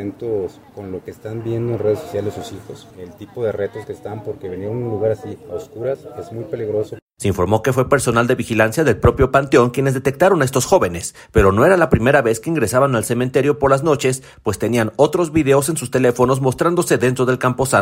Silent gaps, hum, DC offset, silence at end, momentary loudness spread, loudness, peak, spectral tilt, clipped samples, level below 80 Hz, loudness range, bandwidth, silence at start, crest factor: 7.02-7.07 s; none; under 0.1%; 0 s; 16 LU; -17 LUFS; -2 dBFS; -5.5 dB/octave; under 0.1%; -38 dBFS; 10 LU; 16.5 kHz; 0 s; 16 dB